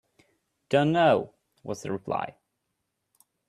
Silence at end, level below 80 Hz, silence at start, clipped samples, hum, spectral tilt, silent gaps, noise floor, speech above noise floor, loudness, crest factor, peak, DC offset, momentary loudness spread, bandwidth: 1.2 s; -68 dBFS; 0.7 s; under 0.1%; none; -6.5 dB/octave; none; -80 dBFS; 55 dB; -26 LUFS; 20 dB; -8 dBFS; under 0.1%; 19 LU; 13.5 kHz